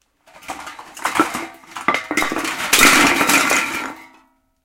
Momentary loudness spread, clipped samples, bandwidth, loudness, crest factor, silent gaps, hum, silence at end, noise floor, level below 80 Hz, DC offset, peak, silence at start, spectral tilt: 22 LU; under 0.1%; 17 kHz; -15 LUFS; 20 dB; none; none; 0.6 s; -55 dBFS; -46 dBFS; under 0.1%; 0 dBFS; 0.45 s; -1 dB/octave